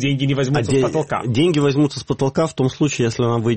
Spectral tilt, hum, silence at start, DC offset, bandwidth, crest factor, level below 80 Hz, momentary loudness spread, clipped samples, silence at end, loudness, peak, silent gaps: -6 dB/octave; none; 0 s; 0.2%; 8.8 kHz; 12 dB; -48 dBFS; 4 LU; under 0.1%; 0 s; -19 LUFS; -6 dBFS; none